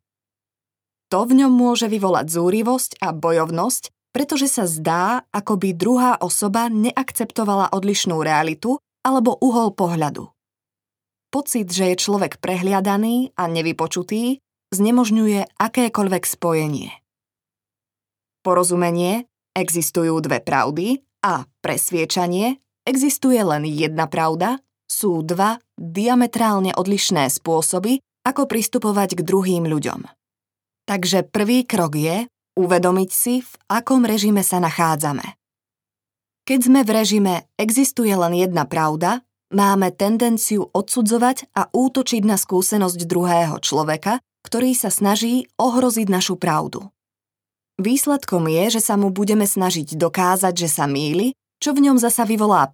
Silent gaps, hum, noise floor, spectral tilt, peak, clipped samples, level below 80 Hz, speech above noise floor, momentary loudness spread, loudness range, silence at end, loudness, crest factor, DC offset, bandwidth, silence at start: none; none; under -90 dBFS; -4.5 dB/octave; -2 dBFS; under 0.1%; -68 dBFS; over 72 dB; 7 LU; 3 LU; 0.05 s; -19 LUFS; 18 dB; under 0.1%; 19.5 kHz; 1.1 s